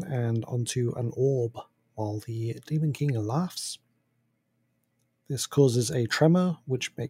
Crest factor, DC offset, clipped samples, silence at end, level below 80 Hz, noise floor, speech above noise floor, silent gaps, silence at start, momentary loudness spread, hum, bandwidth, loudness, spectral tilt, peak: 20 dB; under 0.1%; under 0.1%; 0 s; -68 dBFS; -74 dBFS; 47 dB; none; 0 s; 13 LU; none; 16 kHz; -28 LUFS; -6 dB/octave; -8 dBFS